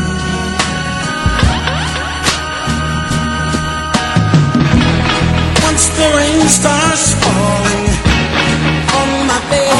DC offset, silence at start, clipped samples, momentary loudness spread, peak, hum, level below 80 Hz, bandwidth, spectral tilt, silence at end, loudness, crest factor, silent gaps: under 0.1%; 0 s; under 0.1%; 6 LU; 0 dBFS; none; -24 dBFS; 15.5 kHz; -4 dB/octave; 0 s; -12 LUFS; 12 dB; none